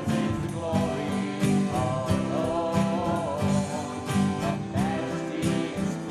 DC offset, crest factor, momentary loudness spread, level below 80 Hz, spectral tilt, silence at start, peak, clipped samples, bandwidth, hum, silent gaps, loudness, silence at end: under 0.1%; 14 dB; 4 LU; -50 dBFS; -6.5 dB/octave; 0 s; -12 dBFS; under 0.1%; 13.5 kHz; none; none; -27 LUFS; 0 s